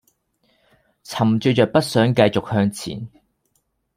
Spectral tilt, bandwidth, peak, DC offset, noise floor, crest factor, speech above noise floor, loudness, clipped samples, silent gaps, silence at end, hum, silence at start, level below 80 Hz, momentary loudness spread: -6 dB/octave; 16 kHz; -2 dBFS; under 0.1%; -69 dBFS; 20 dB; 51 dB; -19 LUFS; under 0.1%; none; 0.9 s; none; 1.1 s; -56 dBFS; 15 LU